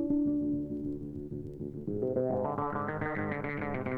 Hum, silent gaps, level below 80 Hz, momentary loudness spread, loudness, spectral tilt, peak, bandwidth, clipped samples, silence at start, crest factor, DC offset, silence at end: none; none; -54 dBFS; 10 LU; -34 LUFS; -10.5 dB/octave; -18 dBFS; 4.3 kHz; under 0.1%; 0 s; 14 dB; under 0.1%; 0 s